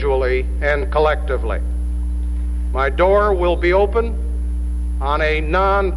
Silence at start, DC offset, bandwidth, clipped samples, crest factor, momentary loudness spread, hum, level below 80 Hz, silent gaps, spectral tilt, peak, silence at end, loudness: 0 s; under 0.1%; 10.5 kHz; under 0.1%; 14 dB; 9 LU; 60 Hz at -20 dBFS; -20 dBFS; none; -7.5 dB/octave; -4 dBFS; 0 s; -19 LUFS